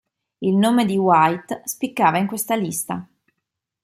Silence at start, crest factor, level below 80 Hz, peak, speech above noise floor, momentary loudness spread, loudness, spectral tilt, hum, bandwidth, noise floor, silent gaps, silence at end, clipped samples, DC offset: 0.4 s; 18 dB; -66 dBFS; -2 dBFS; 61 dB; 11 LU; -20 LUFS; -5 dB/octave; none; 16 kHz; -80 dBFS; none; 0.8 s; under 0.1%; under 0.1%